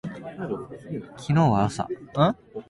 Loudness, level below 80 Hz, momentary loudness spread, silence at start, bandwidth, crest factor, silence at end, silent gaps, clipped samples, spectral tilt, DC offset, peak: -25 LUFS; -52 dBFS; 15 LU; 0.05 s; 11.5 kHz; 18 dB; 0.05 s; none; under 0.1%; -7.5 dB/octave; under 0.1%; -8 dBFS